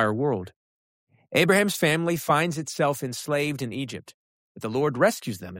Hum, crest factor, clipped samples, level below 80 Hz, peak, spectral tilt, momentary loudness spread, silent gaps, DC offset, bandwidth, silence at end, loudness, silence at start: none; 18 dB; under 0.1%; -66 dBFS; -8 dBFS; -4.5 dB/octave; 13 LU; 0.56-1.07 s, 4.14-4.55 s; under 0.1%; 16.5 kHz; 0 s; -25 LUFS; 0 s